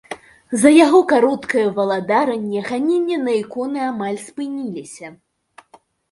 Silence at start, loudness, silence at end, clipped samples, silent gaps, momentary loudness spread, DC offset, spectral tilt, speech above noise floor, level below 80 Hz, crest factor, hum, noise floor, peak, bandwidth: 0.1 s; -17 LUFS; 1 s; under 0.1%; none; 20 LU; under 0.1%; -4.5 dB/octave; 35 dB; -64 dBFS; 18 dB; none; -52 dBFS; 0 dBFS; 11.5 kHz